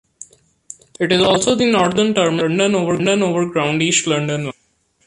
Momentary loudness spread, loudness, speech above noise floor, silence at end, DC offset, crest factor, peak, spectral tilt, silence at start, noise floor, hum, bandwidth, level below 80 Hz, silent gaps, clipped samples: 8 LU; -16 LUFS; 45 dB; 0.55 s; under 0.1%; 16 dB; -2 dBFS; -4 dB/octave; 0.2 s; -61 dBFS; none; 11.5 kHz; -54 dBFS; none; under 0.1%